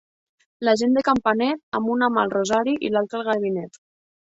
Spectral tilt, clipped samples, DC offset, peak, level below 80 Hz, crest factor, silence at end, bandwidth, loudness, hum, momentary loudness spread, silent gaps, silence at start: -5 dB/octave; under 0.1%; under 0.1%; -6 dBFS; -60 dBFS; 16 dB; 0.65 s; 8 kHz; -22 LUFS; none; 7 LU; 1.63-1.72 s; 0.6 s